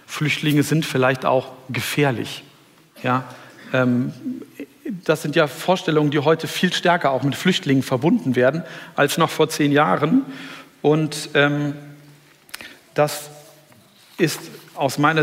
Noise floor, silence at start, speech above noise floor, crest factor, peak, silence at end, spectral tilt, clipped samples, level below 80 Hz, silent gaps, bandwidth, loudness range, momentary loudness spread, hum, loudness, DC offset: -51 dBFS; 0.1 s; 32 dB; 18 dB; -2 dBFS; 0 s; -5.5 dB/octave; under 0.1%; -66 dBFS; none; 16 kHz; 6 LU; 16 LU; none; -20 LUFS; under 0.1%